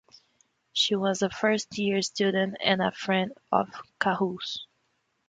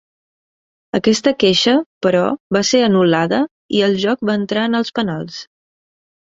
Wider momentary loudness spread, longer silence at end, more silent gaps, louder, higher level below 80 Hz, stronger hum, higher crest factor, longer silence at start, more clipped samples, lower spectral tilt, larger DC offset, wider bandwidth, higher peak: about the same, 7 LU vs 8 LU; second, 0.65 s vs 0.85 s; second, none vs 1.86-2.01 s, 2.40-2.50 s, 3.51-3.69 s; second, -27 LUFS vs -16 LUFS; second, -68 dBFS vs -56 dBFS; neither; first, 22 dB vs 16 dB; second, 0.75 s vs 0.95 s; neither; about the same, -4 dB/octave vs -4.5 dB/octave; neither; first, 9.4 kHz vs 7.8 kHz; second, -6 dBFS vs -2 dBFS